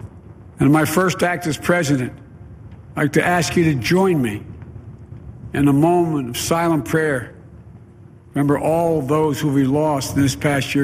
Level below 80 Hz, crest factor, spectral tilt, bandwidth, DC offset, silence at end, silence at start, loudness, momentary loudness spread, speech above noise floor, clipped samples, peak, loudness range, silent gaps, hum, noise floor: -44 dBFS; 16 dB; -5.5 dB/octave; 15.5 kHz; under 0.1%; 0 s; 0 s; -18 LUFS; 21 LU; 26 dB; under 0.1%; -2 dBFS; 2 LU; none; none; -43 dBFS